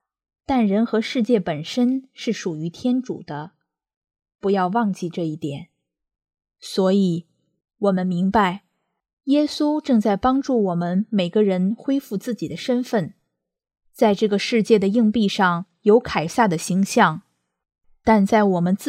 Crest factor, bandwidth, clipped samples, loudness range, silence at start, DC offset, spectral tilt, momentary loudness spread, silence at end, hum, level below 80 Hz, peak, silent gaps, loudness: 18 dB; 15 kHz; under 0.1%; 6 LU; 0.5 s; under 0.1%; -6 dB/octave; 10 LU; 0 s; none; -54 dBFS; -2 dBFS; 3.96-4.01 s, 9.13-9.17 s; -21 LUFS